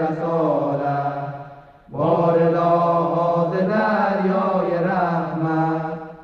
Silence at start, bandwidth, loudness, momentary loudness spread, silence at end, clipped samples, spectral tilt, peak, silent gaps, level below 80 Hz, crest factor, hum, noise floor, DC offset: 0 s; 6.6 kHz; -20 LUFS; 9 LU; 0 s; under 0.1%; -9.5 dB/octave; -6 dBFS; none; -58 dBFS; 14 dB; none; -42 dBFS; under 0.1%